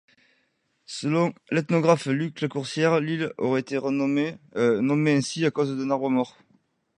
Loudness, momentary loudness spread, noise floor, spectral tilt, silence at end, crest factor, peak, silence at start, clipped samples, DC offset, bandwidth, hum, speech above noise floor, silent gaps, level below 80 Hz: -25 LUFS; 7 LU; -71 dBFS; -6 dB/octave; 0.65 s; 20 dB; -6 dBFS; 0.9 s; under 0.1%; under 0.1%; 11 kHz; none; 47 dB; none; -70 dBFS